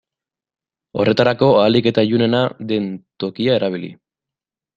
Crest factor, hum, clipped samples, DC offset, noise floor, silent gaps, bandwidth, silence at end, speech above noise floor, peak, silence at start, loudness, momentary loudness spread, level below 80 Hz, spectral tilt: 16 dB; none; under 0.1%; under 0.1%; -90 dBFS; none; 7.4 kHz; 0.8 s; 74 dB; -2 dBFS; 0.95 s; -17 LUFS; 14 LU; -56 dBFS; -7.5 dB/octave